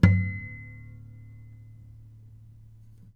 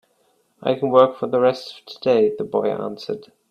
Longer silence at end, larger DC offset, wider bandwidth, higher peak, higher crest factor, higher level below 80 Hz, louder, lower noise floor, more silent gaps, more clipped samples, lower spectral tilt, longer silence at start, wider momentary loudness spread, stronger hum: first, 2.35 s vs 0.3 s; neither; second, 5.8 kHz vs 9 kHz; about the same, -2 dBFS vs 0 dBFS; first, 26 dB vs 20 dB; first, -46 dBFS vs -66 dBFS; second, -28 LUFS vs -20 LUFS; second, -50 dBFS vs -64 dBFS; neither; neither; first, -9 dB/octave vs -7 dB/octave; second, 0 s vs 0.6 s; first, 23 LU vs 15 LU; neither